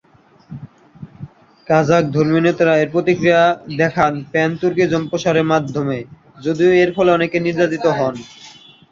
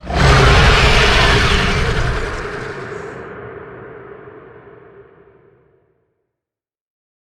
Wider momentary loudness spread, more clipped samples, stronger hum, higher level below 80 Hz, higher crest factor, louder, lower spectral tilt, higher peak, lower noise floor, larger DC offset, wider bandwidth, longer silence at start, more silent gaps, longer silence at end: second, 18 LU vs 24 LU; neither; neither; second, -52 dBFS vs -22 dBFS; about the same, 16 dB vs 16 dB; second, -16 LUFS vs -13 LUFS; first, -6.5 dB/octave vs -4.5 dB/octave; about the same, -2 dBFS vs 0 dBFS; second, -47 dBFS vs -87 dBFS; neither; second, 7.4 kHz vs 13 kHz; first, 0.5 s vs 0.05 s; neither; second, 0.4 s vs 2.85 s